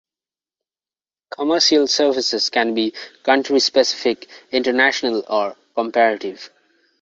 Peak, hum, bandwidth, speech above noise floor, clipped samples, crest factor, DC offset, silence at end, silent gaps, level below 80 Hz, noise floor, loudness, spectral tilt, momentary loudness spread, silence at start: -2 dBFS; none; 7.8 kHz; over 72 dB; under 0.1%; 18 dB; under 0.1%; 0.55 s; none; -66 dBFS; under -90 dBFS; -18 LUFS; -1.5 dB/octave; 11 LU; 1.4 s